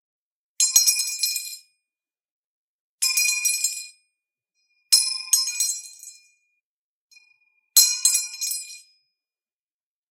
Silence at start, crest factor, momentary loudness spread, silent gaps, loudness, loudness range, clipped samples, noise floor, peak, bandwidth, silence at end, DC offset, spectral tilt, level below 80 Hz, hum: 0.6 s; 26 dB; 18 LU; 2.25-2.98 s, 6.65-7.10 s; -19 LUFS; 3 LU; under 0.1%; under -90 dBFS; 0 dBFS; 16.5 kHz; 1.3 s; under 0.1%; 9 dB/octave; -88 dBFS; none